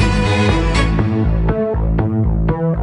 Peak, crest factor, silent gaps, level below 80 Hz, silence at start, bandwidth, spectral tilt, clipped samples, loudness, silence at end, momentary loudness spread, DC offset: 0 dBFS; 14 dB; none; -20 dBFS; 0 s; 10.5 kHz; -7 dB/octave; under 0.1%; -16 LUFS; 0 s; 3 LU; under 0.1%